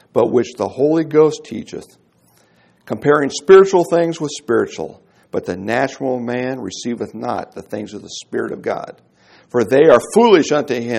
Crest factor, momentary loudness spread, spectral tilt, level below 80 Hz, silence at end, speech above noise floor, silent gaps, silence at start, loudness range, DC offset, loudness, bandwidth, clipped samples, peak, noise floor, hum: 16 dB; 18 LU; -5.5 dB/octave; -60 dBFS; 0 s; 39 dB; none; 0.15 s; 8 LU; under 0.1%; -16 LUFS; 12.5 kHz; under 0.1%; 0 dBFS; -55 dBFS; none